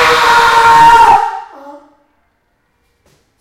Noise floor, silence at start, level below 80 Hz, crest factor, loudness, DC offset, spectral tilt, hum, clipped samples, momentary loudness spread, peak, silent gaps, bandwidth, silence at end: -60 dBFS; 0 s; -38 dBFS; 10 dB; -6 LUFS; under 0.1%; -2 dB/octave; none; 1%; 13 LU; 0 dBFS; none; 16 kHz; 1.7 s